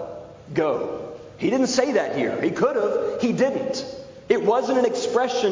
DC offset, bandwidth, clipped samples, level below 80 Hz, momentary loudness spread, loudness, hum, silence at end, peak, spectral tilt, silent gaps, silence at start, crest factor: under 0.1%; 7.6 kHz; under 0.1%; -60 dBFS; 14 LU; -23 LUFS; none; 0 s; -6 dBFS; -4.5 dB/octave; none; 0 s; 16 dB